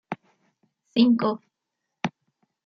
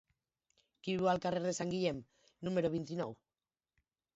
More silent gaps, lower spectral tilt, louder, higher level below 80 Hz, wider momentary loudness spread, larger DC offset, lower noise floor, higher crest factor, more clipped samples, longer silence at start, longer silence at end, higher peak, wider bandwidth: neither; about the same, -6.5 dB/octave vs -5.5 dB/octave; first, -24 LUFS vs -37 LUFS; about the same, -72 dBFS vs -72 dBFS; first, 18 LU vs 12 LU; neither; second, -82 dBFS vs under -90 dBFS; about the same, 22 dB vs 18 dB; neither; second, 0.1 s vs 0.85 s; second, 0.55 s vs 1 s; first, -6 dBFS vs -20 dBFS; second, 6.6 kHz vs 7.6 kHz